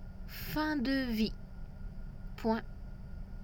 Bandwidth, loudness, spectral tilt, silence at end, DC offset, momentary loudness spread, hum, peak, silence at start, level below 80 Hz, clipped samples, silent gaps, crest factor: over 20 kHz; -35 LUFS; -6 dB/octave; 0 s; under 0.1%; 17 LU; none; -20 dBFS; 0 s; -44 dBFS; under 0.1%; none; 18 dB